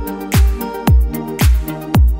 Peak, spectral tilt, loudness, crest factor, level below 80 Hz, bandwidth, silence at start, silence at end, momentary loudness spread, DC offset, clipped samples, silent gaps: -2 dBFS; -6 dB/octave; -16 LUFS; 12 dB; -16 dBFS; 16.5 kHz; 0 s; 0 s; 5 LU; under 0.1%; under 0.1%; none